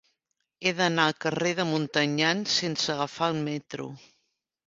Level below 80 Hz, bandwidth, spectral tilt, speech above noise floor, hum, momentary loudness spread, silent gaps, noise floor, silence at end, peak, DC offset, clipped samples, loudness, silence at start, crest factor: -68 dBFS; 7.8 kHz; -4 dB/octave; 53 dB; none; 10 LU; none; -80 dBFS; 0.7 s; -6 dBFS; under 0.1%; under 0.1%; -26 LUFS; 0.6 s; 22 dB